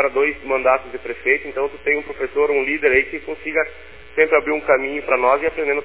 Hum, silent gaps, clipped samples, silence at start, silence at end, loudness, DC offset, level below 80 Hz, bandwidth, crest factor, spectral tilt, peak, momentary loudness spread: none; none; under 0.1%; 0 s; 0 s; -19 LUFS; 0.7%; -48 dBFS; 4 kHz; 18 dB; -7.5 dB/octave; -2 dBFS; 9 LU